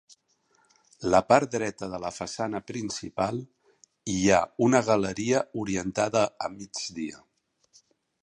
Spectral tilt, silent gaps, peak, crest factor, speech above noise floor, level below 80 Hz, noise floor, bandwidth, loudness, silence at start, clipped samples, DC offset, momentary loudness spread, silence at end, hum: -4.5 dB/octave; none; -4 dBFS; 24 dB; 42 dB; -56 dBFS; -68 dBFS; 11 kHz; -27 LUFS; 1 s; under 0.1%; under 0.1%; 12 LU; 1.05 s; none